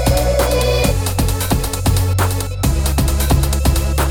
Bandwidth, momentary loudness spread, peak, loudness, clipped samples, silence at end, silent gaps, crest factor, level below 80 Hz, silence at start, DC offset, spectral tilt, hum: 18.5 kHz; 3 LU; -2 dBFS; -16 LUFS; under 0.1%; 0 s; none; 14 dB; -18 dBFS; 0 s; under 0.1%; -5 dB/octave; none